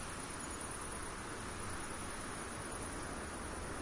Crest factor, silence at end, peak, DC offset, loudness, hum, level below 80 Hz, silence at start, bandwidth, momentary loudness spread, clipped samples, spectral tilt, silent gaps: 14 dB; 0 s; -30 dBFS; under 0.1%; -44 LUFS; none; -54 dBFS; 0 s; 11.5 kHz; 1 LU; under 0.1%; -3.5 dB/octave; none